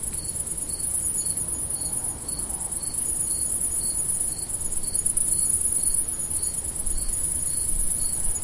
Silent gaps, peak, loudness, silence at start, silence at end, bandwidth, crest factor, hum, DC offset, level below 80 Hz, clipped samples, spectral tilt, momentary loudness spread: none; -4 dBFS; -23 LUFS; 0 s; 0 s; 11.5 kHz; 20 dB; none; under 0.1%; -38 dBFS; under 0.1%; -1.5 dB/octave; 7 LU